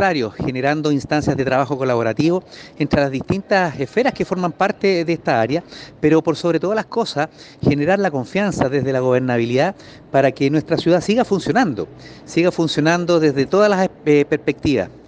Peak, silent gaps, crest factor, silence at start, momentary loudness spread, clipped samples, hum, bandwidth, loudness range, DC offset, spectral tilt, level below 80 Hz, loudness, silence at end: -4 dBFS; none; 14 dB; 0 s; 6 LU; under 0.1%; none; 9.4 kHz; 2 LU; under 0.1%; -6.5 dB/octave; -48 dBFS; -18 LUFS; 0.1 s